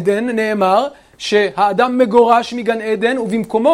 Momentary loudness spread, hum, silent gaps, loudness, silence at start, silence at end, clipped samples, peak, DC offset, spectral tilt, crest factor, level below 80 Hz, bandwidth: 7 LU; none; none; -15 LUFS; 0 s; 0 s; under 0.1%; 0 dBFS; under 0.1%; -5 dB/octave; 14 dB; -56 dBFS; 15 kHz